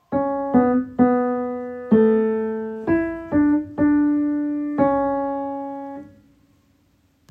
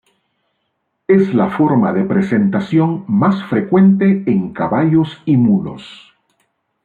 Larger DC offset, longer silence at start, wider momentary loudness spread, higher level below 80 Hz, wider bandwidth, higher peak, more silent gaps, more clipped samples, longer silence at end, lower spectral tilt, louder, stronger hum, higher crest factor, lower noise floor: neither; second, 0.1 s vs 1.1 s; first, 11 LU vs 7 LU; about the same, -52 dBFS vs -54 dBFS; second, 3.8 kHz vs 4.6 kHz; about the same, -4 dBFS vs -2 dBFS; neither; neither; first, 1.25 s vs 0.9 s; about the same, -10.5 dB/octave vs -9.5 dB/octave; second, -21 LUFS vs -14 LUFS; neither; about the same, 16 dB vs 12 dB; second, -61 dBFS vs -70 dBFS